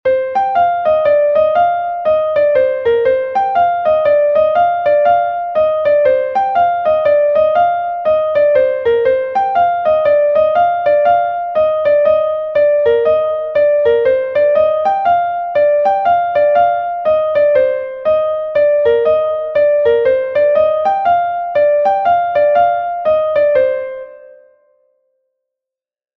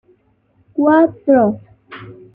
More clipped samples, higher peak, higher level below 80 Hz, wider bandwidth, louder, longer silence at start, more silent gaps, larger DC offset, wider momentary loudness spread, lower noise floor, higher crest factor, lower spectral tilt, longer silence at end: neither; about the same, -2 dBFS vs -2 dBFS; first, -52 dBFS vs -58 dBFS; first, 5.2 kHz vs 3.8 kHz; about the same, -13 LUFS vs -14 LUFS; second, 0.05 s vs 0.75 s; neither; neither; second, 4 LU vs 23 LU; first, -86 dBFS vs -58 dBFS; about the same, 10 dB vs 14 dB; second, -6 dB/octave vs -10 dB/octave; first, 2 s vs 0.2 s